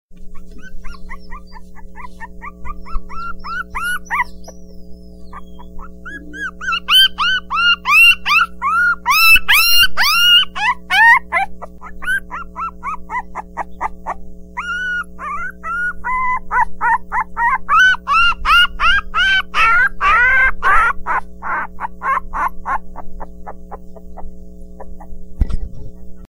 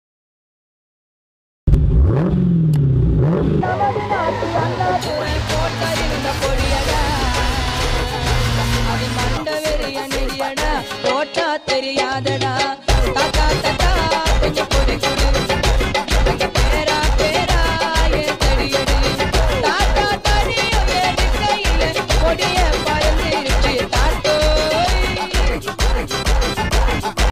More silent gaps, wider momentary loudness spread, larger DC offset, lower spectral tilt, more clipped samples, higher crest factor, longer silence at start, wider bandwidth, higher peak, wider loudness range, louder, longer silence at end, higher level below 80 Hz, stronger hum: neither; first, 23 LU vs 4 LU; neither; second, -1 dB/octave vs -4.5 dB/octave; neither; about the same, 16 dB vs 16 dB; second, 0.1 s vs 1.65 s; about the same, 16 kHz vs 16 kHz; about the same, 0 dBFS vs 0 dBFS; first, 15 LU vs 3 LU; first, -13 LUFS vs -17 LUFS; about the same, 0.05 s vs 0 s; second, -30 dBFS vs -20 dBFS; neither